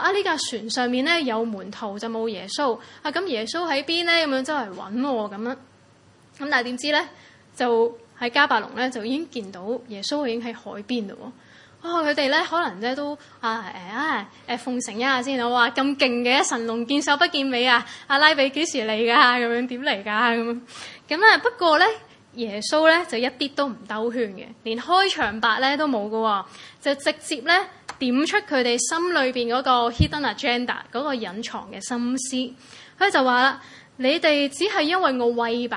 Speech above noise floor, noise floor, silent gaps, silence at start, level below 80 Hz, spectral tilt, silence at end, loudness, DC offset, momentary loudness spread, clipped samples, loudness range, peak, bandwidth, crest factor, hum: 31 dB; -54 dBFS; none; 0 s; -52 dBFS; -3 dB/octave; 0 s; -22 LUFS; under 0.1%; 13 LU; under 0.1%; 6 LU; 0 dBFS; 11.5 kHz; 24 dB; none